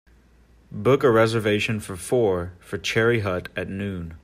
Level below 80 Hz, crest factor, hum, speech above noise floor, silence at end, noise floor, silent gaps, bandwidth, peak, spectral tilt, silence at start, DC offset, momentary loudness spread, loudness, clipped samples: -52 dBFS; 16 dB; none; 32 dB; 0.05 s; -55 dBFS; none; 15.5 kHz; -6 dBFS; -5.5 dB/octave; 0.7 s; under 0.1%; 12 LU; -23 LUFS; under 0.1%